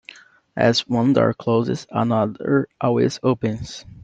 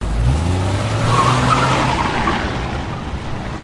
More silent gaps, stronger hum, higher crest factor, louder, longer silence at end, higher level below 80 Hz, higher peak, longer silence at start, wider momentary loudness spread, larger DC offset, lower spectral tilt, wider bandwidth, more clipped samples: neither; neither; about the same, 18 dB vs 16 dB; about the same, -20 LUFS vs -18 LUFS; about the same, 0 s vs 0 s; second, -54 dBFS vs -26 dBFS; about the same, -2 dBFS vs -2 dBFS; first, 0.55 s vs 0 s; second, 8 LU vs 11 LU; neither; about the same, -6.5 dB/octave vs -5.5 dB/octave; second, 8.2 kHz vs 11.5 kHz; neither